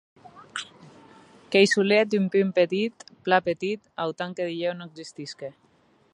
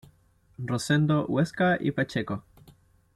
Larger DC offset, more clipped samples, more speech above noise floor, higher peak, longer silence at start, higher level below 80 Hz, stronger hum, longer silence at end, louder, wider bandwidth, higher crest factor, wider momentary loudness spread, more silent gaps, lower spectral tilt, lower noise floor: neither; neither; about the same, 37 dB vs 36 dB; first, -4 dBFS vs -12 dBFS; second, 0.35 s vs 0.6 s; second, -74 dBFS vs -60 dBFS; neither; about the same, 0.65 s vs 0.75 s; first, -24 LUFS vs -27 LUFS; second, 11 kHz vs 13 kHz; first, 22 dB vs 16 dB; first, 18 LU vs 12 LU; neither; second, -5 dB/octave vs -6.5 dB/octave; about the same, -62 dBFS vs -62 dBFS